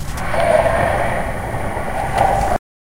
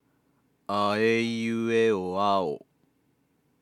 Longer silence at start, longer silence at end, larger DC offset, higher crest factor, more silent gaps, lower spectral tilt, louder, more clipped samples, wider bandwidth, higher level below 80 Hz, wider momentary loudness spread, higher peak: second, 0 s vs 0.7 s; second, 0.4 s vs 1.05 s; neither; about the same, 18 dB vs 16 dB; neither; about the same, -5.5 dB/octave vs -5.5 dB/octave; first, -18 LUFS vs -26 LUFS; neither; first, 16 kHz vs 12 kHz; first, -28 dBFS vs -80 dBFS; about the same, 9 LU vs 9 LU; first, 0 dBFS vs -12 dBFS